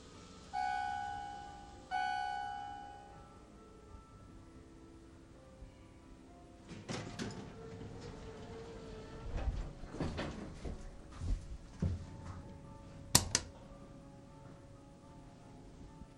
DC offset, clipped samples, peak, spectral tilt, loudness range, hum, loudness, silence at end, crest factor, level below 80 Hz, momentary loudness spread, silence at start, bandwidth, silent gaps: under 0.1%; under 0.1%; -6 dBFS; -3 dB/octave; 16 LU; none; -41 LUFS; 0 s; 38 dB; -50 dBFS; 20 LU; 0 s; 16 kHz; none